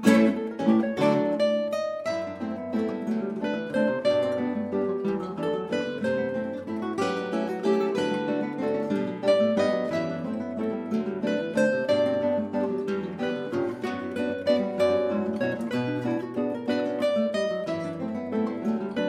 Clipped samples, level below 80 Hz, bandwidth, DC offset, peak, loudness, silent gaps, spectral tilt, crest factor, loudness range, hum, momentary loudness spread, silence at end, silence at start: under 0.1%; -68 dBFS; 12.5 kHz; under 0.1%; -6 dBFS; -27 LUFS; none; -6.5 dB/octave; 20 dB; 2 LU; none; 7 LU; 0 s; 0 s